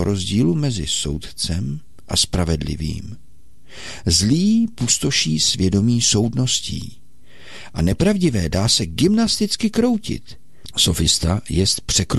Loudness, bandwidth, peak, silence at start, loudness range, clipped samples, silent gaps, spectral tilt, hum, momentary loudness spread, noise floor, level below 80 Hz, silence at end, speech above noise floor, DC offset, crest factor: -18 LUFS; 13 kHz; -4 dBFS; 0 s; 5 LU; under 0.1%; none; -4 dB/octave; none; 13 LU; -50 dBFS; -36 dBFS; 0 s; 31 dB; 2%; 14 dB